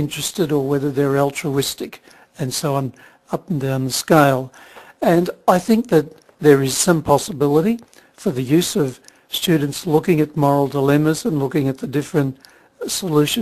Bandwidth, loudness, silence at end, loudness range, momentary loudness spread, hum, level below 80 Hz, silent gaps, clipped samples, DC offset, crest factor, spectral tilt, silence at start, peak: 14 kHz; -18 LUFS; 0 s; 4 LU; 10 LU; none; -54 dBFS; none; under 0.1%; under 0.1%; 18 dB; -5 dB/octave; 0 s; 0 dBFS